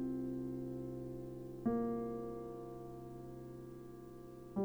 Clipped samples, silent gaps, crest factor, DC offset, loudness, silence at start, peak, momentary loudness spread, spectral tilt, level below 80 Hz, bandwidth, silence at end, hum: under 0.1%; none; 18 dB; under 0.1%; -44 LUFS; 0 s; -26 dBFS; 14 LU; -9.5 dB/octave; -64 dBFS; over 20 kHz; 0 s; none